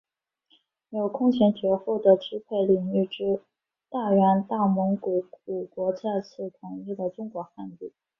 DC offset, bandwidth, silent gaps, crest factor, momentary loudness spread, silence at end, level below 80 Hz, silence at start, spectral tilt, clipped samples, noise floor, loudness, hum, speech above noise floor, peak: under 0.1%; 6 kHz; none; 20 dB; 16 LU; 0.3 s; -68 dBFS; 0.9 s; -9.5 dB/octave; under 0.1%; -68 dBFS; -25 LUFS; none; 43 dB; -6 dBFS